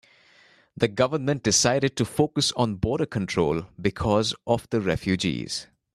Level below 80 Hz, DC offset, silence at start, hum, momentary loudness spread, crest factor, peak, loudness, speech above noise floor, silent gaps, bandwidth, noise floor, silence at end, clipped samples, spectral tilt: -48 dBFS; under 0.1%; 0.8 s; none; 7 LU; 20 dB; -6 dBFS; -24 LUFS; 33 dB; none; 13.5 kHz; -57 dBFS; 0.3 s; under 0.1%; -4 dB/octave